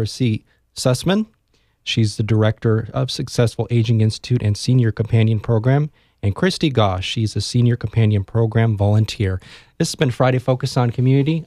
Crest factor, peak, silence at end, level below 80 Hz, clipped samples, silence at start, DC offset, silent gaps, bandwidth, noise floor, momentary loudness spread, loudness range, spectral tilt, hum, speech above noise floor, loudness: 16 dB; -2 dBFS; 0 s; -46 dBFS; under 0.1%; 0 s; under 0.1%; none; 12.5 kHz; -62 dBFS; 6 LU; 2 LU; -6.5 dB/octave; none; 44 dB; -19 LUFS